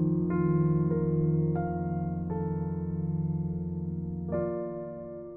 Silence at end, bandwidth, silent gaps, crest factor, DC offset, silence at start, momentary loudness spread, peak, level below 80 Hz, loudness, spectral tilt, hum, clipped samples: 0 s; 2.6 kHz; none; 14 dB; under 0.1%; 0 s; 9 LU; -16 dBFS; -54 dBFS; -30 LUFS; -14.5 dB/octave; none; under 0.1%